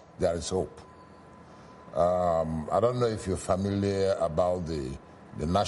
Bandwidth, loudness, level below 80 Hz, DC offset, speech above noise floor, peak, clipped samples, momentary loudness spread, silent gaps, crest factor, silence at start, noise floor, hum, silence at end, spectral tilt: 11.5 kHz; -29 LUFS; -48 dBFS; under 0.1%; 23 dB; -14 dBFS; under 0.1%; 12 LU; none; 16 dB; 0.2 s; -51 dBFS; none; 0 s; -6 dB/octave